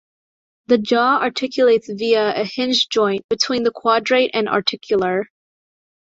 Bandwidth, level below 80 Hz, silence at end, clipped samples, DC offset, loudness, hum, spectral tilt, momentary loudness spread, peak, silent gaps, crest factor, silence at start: 7.8 kHz; -62 dBFS; 0.8 s; under 0.1%; under 0.1%; -18 LUFS; none; -3.5 dB/octave; 5 LU; -2 dBFS; 3.24-3.29 s; 16 dB; 0.7 s